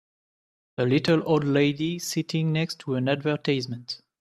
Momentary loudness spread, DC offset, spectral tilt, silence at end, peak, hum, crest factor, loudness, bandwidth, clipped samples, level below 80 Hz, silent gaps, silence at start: 10 LU; under 0.1%; -6 dB/octave; 0.25 s; -8 dBFS; none; 18 dB; -25 LUFS; 14 kHz; under 0.1%; -64 dBFS; none; 0.8 s